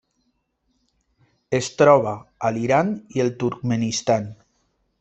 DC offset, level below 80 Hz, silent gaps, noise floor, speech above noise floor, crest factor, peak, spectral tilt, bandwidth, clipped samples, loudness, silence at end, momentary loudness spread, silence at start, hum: under 0.1%; -60 dBFS; none; -71 dBFS; 50 dB; 20 dB; -2 dBFS; -5.5 dB/octave; 8.4 kHz; under 0.1%; -21 LUFS; 0.65 s; 11 LU; 1.5 s; none